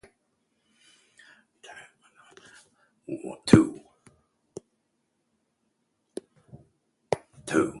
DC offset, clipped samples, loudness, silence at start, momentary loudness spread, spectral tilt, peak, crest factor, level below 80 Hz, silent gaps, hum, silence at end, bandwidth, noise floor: under 0.1%; under 0.1%; -25 LUFS; 1.7 s; 28 LU; -6.5 dB/octave; 0 dBFS; 30 dB; -56 dBFS; none; none; 0 s; 11.5 kHz; -76 dBFS